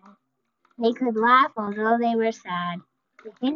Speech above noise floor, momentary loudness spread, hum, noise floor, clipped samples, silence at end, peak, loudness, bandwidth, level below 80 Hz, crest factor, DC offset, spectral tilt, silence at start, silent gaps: 52 dB; 12 LU; none; -74 dBFS; under 0.1%; 0 s; -6 dBFS; -23 LUFS; 7.2 kHz; -76 dBFS; 18 dB; under 0.1%; -3 dB/octave; 0.8 s; none